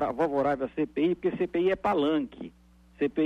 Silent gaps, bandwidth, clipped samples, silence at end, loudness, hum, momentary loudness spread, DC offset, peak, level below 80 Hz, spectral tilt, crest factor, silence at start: none; 8 kHz; under 0.1%; 0 s; -28 LUFS; none; 9 LU; under 0.1%; -16 dBFS; -56 dBFS; -7.5 dB/octave; 12 dB; 0 s